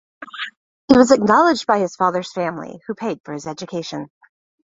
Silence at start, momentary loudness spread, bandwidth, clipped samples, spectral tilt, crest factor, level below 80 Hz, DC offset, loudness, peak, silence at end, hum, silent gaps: 0.2 s; 18 LU; 7.8 kHz; under 0.1%; -5 dB/octave; 20 dB; -54 dBFS; under 0.1%; -18 LUFS; 0 dBFS; 0.65 s; none; 0.57-0.88 s, 3.20-3.24 s